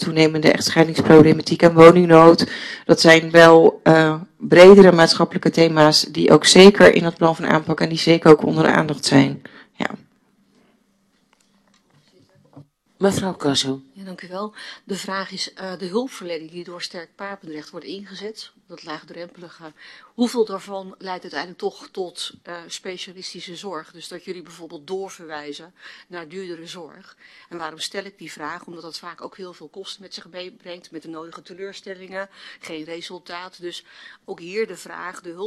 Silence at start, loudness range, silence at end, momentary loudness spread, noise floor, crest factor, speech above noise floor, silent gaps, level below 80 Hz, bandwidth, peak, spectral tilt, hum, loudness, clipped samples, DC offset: 0 s; 23 LU; 0 s; 26 LU; -63 dBFS; 18 dB; 46 dB; none; -54 dBFS; 13 kHz; 0 dBFS; -5 dB/octave; none; -14 LUFS; under 0.1%; under 0.1%